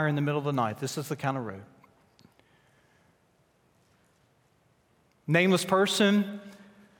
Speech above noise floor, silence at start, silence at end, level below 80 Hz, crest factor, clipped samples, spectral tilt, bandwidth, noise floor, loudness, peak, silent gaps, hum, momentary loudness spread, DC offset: 40 dB; 0 s; 0.45 s; -76 dBFS; 22 dB; under 0.1%; -5 dB/octave; 17 kHz; -67 dBFS; -27 LUFS; -8 dBFS; none; none; 20 LU; under 0.1%